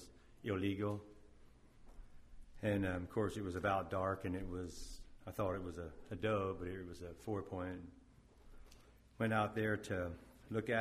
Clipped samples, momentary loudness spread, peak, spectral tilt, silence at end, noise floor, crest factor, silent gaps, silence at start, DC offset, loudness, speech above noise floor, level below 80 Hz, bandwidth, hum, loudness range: under 0.1%; 13 LU; -22 dBFS; -6.5 dB/octave; 0 s; -64 dBFS; 20 dB; none; 0 s; under 0.1%; -41 LUFS; 23 dB; -60 dBFS; 15 kHz; none; 3 LU